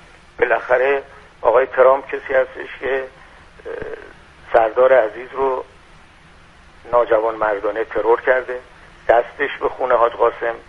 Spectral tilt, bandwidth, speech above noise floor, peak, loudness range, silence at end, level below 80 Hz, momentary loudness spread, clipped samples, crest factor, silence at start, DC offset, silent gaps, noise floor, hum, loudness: -6 dB/octave; 6.4 kHz; 29 dB; 0 dBFS; 2 LU; 0.1 s; -48 dBFS; 16 LU; under 0.1%; 18 dB; 0.4 s; under 0.1%; none; -46 dBFS; none; -18 LUFS